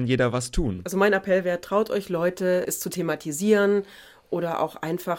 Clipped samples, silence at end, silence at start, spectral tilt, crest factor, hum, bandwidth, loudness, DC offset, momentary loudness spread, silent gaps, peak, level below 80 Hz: under 0.1%; 0 s; 0 s; -5 dB/octave; 16 dB; none; 17 kHz; -24 LUFS; under 0.1%; 8 LU; none; -8 dBFS; -42 dBFS